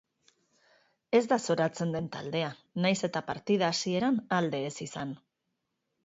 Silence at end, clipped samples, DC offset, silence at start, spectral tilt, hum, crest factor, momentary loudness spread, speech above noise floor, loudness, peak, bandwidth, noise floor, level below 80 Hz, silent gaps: 0.9 s; under 0.1%; under 0.1%; 1.1 s; -5 dB/octave; none; 20 dB; 10 LU; 53 dB; -30 LUFS; -12 dBFS; 8 kHz; -82 dBFS; -70 dBFS; none